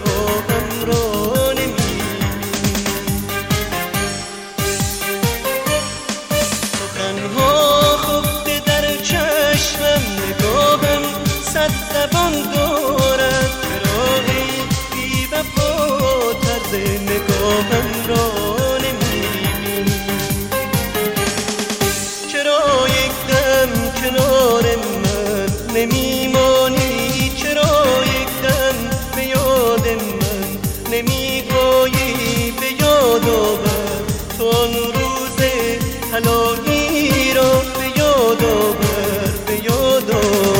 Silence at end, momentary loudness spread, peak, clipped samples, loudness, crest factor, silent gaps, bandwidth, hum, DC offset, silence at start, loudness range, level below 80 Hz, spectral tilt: 0 s; 7 LU; -2 dBFS; under 0.1%; -16 LUFS; 16 dB; none; 17 kHz; none; under 0.1%; 0 s; 4 LU; -32 dBFS; -4 dB/octave